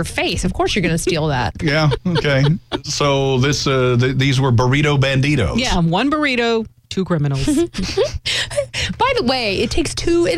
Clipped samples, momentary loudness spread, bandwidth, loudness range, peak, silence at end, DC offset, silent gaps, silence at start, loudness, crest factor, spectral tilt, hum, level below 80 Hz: under 0.1%; 5 LU; 14.5 kHz; 3 LU; -6 dBFS; 0 s; under 0.1%; none; 0 s; -17 LUFS; 12 dB; -5 dB/octave; none; -32 dBFS